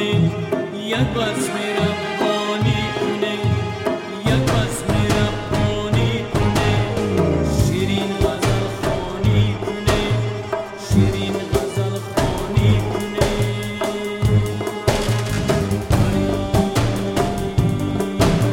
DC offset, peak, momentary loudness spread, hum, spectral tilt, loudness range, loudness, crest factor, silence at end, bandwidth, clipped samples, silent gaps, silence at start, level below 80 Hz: under 0.1%; -4 dBFS; 5 LU; none; -6 dB/octave; 1 LU; -20 LUFS; 16 dB; 0 s; 16.5 kHz; under 0.1%; none; 0 s; -32 dBFS